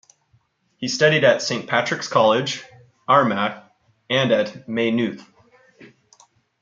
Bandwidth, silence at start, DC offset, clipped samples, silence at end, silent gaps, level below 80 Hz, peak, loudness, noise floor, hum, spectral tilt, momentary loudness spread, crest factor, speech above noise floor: 7.6 kHz; 0.8 s; under 0.1%; under 0.1%; 0.75 s; none; -68 dBFS; -2 dBFS; -20 LUFS; -63 dBFS; none; -4.5 dB/octave; 13 LU; 20 dB; 44 dB